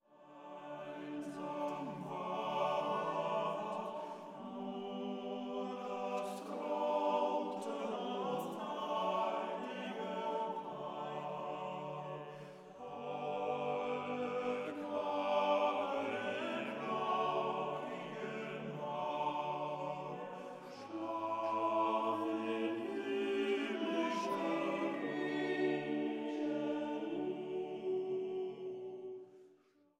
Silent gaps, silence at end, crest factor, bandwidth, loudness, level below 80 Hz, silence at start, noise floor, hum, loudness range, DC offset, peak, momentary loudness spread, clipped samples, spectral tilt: none; 0.5 s; 18 dB; 15 kHz; -39 LUFS; under -90 dBFS; 0.1 s; -69 dBFS; none; 5 LU; under 0.1%; -22 dBFS; 11 LU; under 0.1%; -5.5 dB/octave